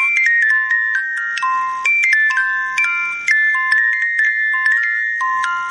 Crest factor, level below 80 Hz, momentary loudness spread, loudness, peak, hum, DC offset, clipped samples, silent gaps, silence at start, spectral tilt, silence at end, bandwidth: 10 dB; -70 dBFS; 6 LU; -14 LUFS; -6 dBFS; none; under 0.1%; under 0.1%; none; 0 s; 2 dB/octave; 0 s; 11 kHz